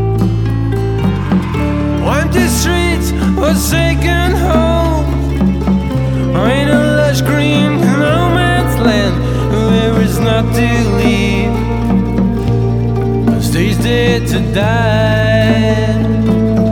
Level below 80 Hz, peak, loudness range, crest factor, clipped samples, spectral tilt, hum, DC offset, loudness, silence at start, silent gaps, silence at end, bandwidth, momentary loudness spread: -20 dBFS; 0 dBFS; 2 LU; 12 dB; under 0.1%; -6 dB/octave; none; under 0.1%; -12 LUFS; 0 s; none; 0 s; 18 kHz; 4 LU